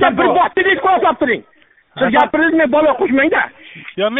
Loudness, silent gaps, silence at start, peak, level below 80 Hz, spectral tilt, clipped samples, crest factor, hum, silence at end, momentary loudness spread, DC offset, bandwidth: -14 LUFS; none; 0 s; 0 dBFS; -50 dBFS; -2 dB/octave; under 0.1%; 14 dB; none; 0 s; 10 LU; under 0.1%; 4 kHz